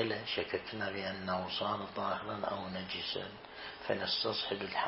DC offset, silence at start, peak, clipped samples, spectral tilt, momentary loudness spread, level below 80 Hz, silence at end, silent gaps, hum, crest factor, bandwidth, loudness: under 0.1%; 0 s; -18 dBFS; under 0.1%; -1.5 dB/octave; 8 LU; -68 dBFS; 0 s; none; none; 20 dB; 5.8 kHz; -37 LUFS